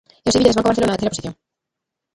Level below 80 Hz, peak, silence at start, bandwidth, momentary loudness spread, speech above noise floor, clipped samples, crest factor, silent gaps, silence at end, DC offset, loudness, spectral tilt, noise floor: -44 dBFS; 0 dBFS; 0.25 s; 11.5 kHz; 13 LU; 65 dB; under 0.1%; 18 dB; none; 0.8 s; under 0.1%; -17 LUFS; -4.5 dB/octave; -82 dBFS